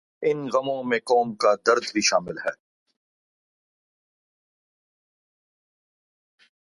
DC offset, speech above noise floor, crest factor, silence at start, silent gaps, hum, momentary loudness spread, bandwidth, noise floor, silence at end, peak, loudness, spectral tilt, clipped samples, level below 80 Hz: under 0.1%; over 67 dB; 24 dB; 0.2 s; none; none; 9 LU; 11.5 kHz; under -90 dBFS; 4.2 s; -4 dBFS; -23 LUFS; -3 dB/octave; under 0.1%; -72 dBFS